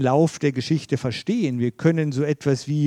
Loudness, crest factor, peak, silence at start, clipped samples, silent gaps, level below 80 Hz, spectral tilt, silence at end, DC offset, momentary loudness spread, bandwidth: -22 LUFS; 16 dB; -4 dBFS; 0 s; under 0.1%; none; -62 dBFS; -7 dB/octave; 0 s; under 0.1%; 5 LU; 11 kHz